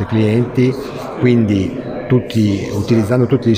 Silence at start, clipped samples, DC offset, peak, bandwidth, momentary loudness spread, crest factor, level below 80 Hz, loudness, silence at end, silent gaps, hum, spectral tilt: 0 s; under 0.1%; under 0.1%; 0 dBFS; 15.5 kHz; 8 LU; 14 dB; -44 dBFS; -16 LUFS; 0 s; none; none; -8 dB/octave